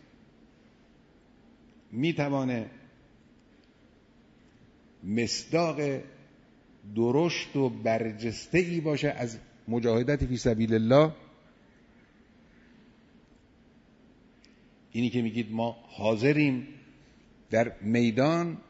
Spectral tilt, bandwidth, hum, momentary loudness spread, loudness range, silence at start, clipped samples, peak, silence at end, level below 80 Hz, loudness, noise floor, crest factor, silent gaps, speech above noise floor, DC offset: -6 dB/octave; 8 kHz; none; 11 LU; 8 LU; 1.9 s; under 0.1%; -10 dBFS; 0.1 s; -54 dBFS; -28 LUFS; -60 dBFS; 20 dB; none; 33 dB; under 0.1%